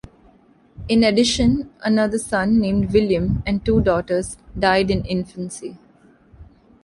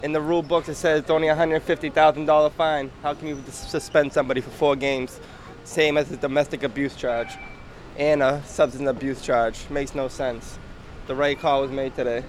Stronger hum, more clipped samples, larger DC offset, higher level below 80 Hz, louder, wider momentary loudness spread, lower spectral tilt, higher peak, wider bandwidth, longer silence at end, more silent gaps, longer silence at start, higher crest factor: neither; neither; neither; first, -36 dBFS vs -44 dBFS; first, -19 LUFS vs -23 LUFS; about the same, 14 LU vs 16 LU; about the same, -5.5 dB/octave vs -5 dB/octave; about the same, -4 dBFS vs -6 dBFS; second, 11.5 kHz vs 14 kHz; first, 0.4 s vs 0 s; neither; first, 0.8 s vs 0 s; about the same, 16 dB vs 18 dB